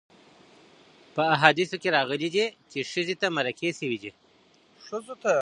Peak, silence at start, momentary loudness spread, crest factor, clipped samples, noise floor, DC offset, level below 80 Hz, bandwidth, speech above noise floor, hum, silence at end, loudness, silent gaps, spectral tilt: 0 dBFS; 1.15 s; 16 LU; 28 dB; under 0.1%; -60 dBFS; under 0.1%; -76 dBFS; 11 kHz; 34 dB; none; 0 s; -26 LUFS; none; -4 dB/octave